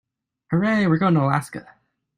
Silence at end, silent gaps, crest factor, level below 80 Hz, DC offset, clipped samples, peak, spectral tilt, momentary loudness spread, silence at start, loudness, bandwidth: 0.55 s; none; 18 dB; -58 dBFS; under 0.1%; under 0.1%; -4 dBFS; -7.5 dB/octave; 15 LU; 0.5 s; -20 LUFS; 12 kHz